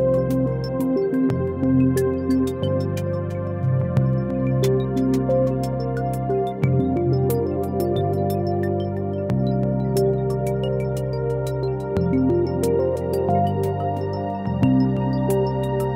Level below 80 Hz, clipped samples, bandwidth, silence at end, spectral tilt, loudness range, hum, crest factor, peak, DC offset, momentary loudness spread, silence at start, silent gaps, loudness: -42 dBFS; under 0.1%; 16 kHz; 0 s; -8.5 dB/octave; 1 LU; none; 14 dB; -6 dBFS; under 0.1%; 5 LU; 0 s; none; -22 LUFS